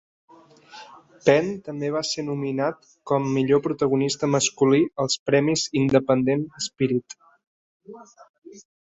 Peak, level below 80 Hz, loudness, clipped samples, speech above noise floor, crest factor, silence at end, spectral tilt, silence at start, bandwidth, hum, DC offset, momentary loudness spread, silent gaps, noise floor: -4 dBFS; -62 dBFS; -23 LUFS; under 0.1%; 26 dB; 20 dB; 0.25 s; -5 dB/octave; 0.75 s; 8.4 kHz; none; under 0.1%; 10 LU; 5.19-5.26 s, 7.47-7.80 s, 8.29-8.42 s; -48 dBFS